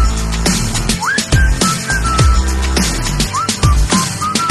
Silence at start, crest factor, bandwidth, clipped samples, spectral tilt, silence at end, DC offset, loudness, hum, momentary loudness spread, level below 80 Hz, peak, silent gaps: 0 s; 14 dB; 12.5 kHz; under 0.1%; -3.5 dB/octave; 0 s; under 0.1%; -14 LUFS; none; 4 LU; -18 dBFS; 0 dBFS; none